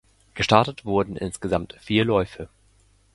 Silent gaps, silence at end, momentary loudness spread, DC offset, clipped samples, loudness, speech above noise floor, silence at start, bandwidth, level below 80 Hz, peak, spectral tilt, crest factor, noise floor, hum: none; 0.7 s; 18 LU; under 0.1%; under 0.1%; -23 LUFS; 36 dB; 0.35 s; 11.5 kHz; -46 dBFS; 0 dBFS; -5.5 dB/octave; 24 dB; -59 dBFS; none